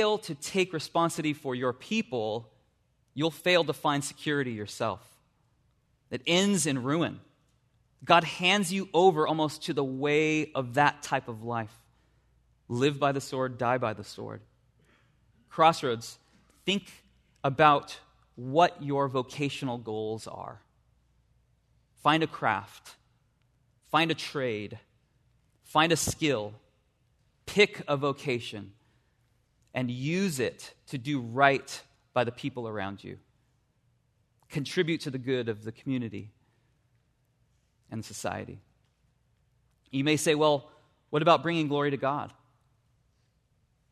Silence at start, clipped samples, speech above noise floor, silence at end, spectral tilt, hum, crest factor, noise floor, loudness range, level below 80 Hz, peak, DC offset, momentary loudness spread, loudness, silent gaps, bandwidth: 0 s; under 0.1%; 42 dB; 1.6 s; -4.5 dB/octave; none; 24 dB; -71 dBFS; 8 LU; -66 dBFS; -6 dBFS; under 0.1%; 18 LU; -28 LUFS; none; 13.5 kHz